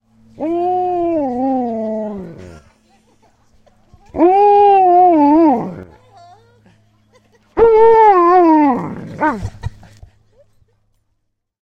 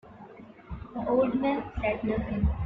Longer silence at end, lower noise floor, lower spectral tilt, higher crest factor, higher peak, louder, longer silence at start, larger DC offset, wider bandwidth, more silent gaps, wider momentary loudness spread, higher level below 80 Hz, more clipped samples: first, 1.95 s vs 0 s; first, -69 dBFS vs -48 dBFS; second, -8.5 dB/octave vs -10 dB/octave; about the same, 14 dB vs 16 dB; first, 0 dBFS vs -14 dBFS; first, -12 LUFS vs -29 LUFS; first, 0.4 s vs 0.05 s; neither; first, 7.6 kHz vs 5 kHz; neither; second, 19 LU vs 22 LU; about the same, -44 dBFS vs -40 dBFS; neither